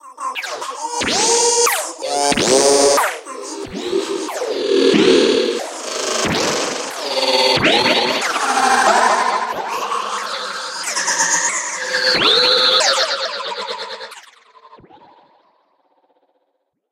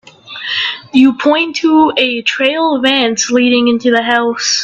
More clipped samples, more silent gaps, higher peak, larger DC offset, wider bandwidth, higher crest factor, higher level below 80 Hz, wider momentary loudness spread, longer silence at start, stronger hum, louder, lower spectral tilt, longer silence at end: neither; neither; about the same, 0 dBFS vs 0 dBFS; neither; first, 17 kHz vs 8.2 kHz; first, 18 dB vs 12 dB; about the same, -54 dBFS vs -56 dBFS; first, 13 LU vs 6 LU; second, 0.05 s vs 0.25 s; neither; second, -16 LUFS vs -11 LUFS; about the same, -1.5 dB/octave vs -2 dB/octave; first, 2.15 s vs 0 s